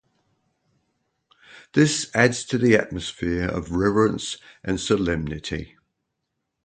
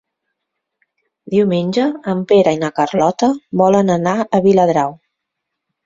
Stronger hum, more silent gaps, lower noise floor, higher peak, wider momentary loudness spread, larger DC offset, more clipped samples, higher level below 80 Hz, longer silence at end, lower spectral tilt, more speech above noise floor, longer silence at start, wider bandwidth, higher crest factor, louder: neither; neither; about the same, -79 dBFS vs -77 dBFS; about the same, -2 dBFS vs -2 dBFS; first, 11 LU vs 6 LU; neither; neither; first, -44 dBFS vs -56 dBFS; about the same, 1 s vs 0.9 s; second, -5 dB/octave vs -6.5 dB/octave; second, 57 dB vs 63 dB; first, 1.55 s vs 1.25 s; first, 9.4 kHz vs 7.6 kHz; first, 22 dB vs 16 dB; second, -23 LUFS vs -15 LUFS